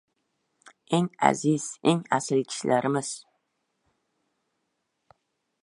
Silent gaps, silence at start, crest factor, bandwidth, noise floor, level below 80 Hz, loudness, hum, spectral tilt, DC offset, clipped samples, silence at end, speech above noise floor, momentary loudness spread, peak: none; 0.9 s; 26 dB; 11.5 kHz; -78 dBFS; -74 dBFS; -26 LUFS; none; -5 dB/octave; under 0.1%; under 0.1%; 2.4 s; 53 dB; 6 LU; -2 dBFS